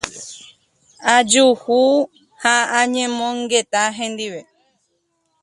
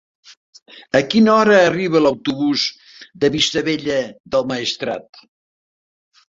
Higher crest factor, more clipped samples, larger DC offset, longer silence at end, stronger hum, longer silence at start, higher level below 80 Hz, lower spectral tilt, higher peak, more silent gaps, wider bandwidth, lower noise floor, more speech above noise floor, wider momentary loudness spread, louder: about the same, 18 dB vs 18 dB; neither; neither; second, 1 s vs 1.4 s; neither; second, 0.05 s vs 0.3 s; second, -62 dBFS vs -56 dBFS; second, -1.5 dB/octave vs -4.5 dB/octave; about the same, 0 dBFS vs -2 dBFS; second, none vs 0.37-0.53 s, 0.62-0.66 s, 4.20-4.24 s; first, 11.5 kHz vs 7.8 kHz; second, -68 dBFS vs under -90 dBFS; second, 52 dB vs over 73 dB; first, 16 LU vs 10 LU; about the same, -17 LUFS vs -17 LUFS